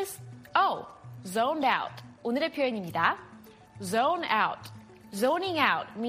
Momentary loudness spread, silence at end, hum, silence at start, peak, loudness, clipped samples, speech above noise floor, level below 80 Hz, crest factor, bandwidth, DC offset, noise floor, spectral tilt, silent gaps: 16 LU; 0 s; none; 0 s; -10 dBFS; -28 LUFS; under 0.1%; 22 dB; -70 dBFS; 20 dB; 15.5 kHz; under 0.1%; -51 dBFS; -4 dB/octave; none